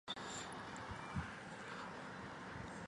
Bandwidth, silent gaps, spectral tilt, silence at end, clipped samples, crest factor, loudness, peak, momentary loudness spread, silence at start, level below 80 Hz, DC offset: 11.5 kHz; none; -4 dB/octave; 0 s; under 0.1%; 18 dB; -48 LUFS; -30 dBFS; 4 LU; 0.05 s; -62 dBFS; under 0.1%